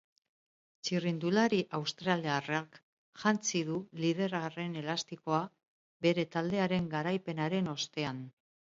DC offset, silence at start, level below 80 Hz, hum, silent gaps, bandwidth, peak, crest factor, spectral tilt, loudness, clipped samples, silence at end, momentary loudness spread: under 0.1%; 0.85 s; -72 dBFS; none; 2.83-3.13 s, 5.68-6.00 s; 7.8 kHz; -12 dBFS; 22 dB; -5 dB/octave; -33 LUFS; under 0.1%; 0.4 s; 7 LU